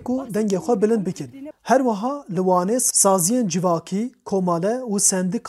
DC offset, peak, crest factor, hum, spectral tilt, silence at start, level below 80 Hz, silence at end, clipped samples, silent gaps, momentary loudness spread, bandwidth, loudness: under 0.1%; -2 dBFS; 18 dB; none; -4.5 dB/octave; 0 s; -64 dBFS; 0 s; under 0.1%; none; 11 LU; 16 kHz; -20 LUFS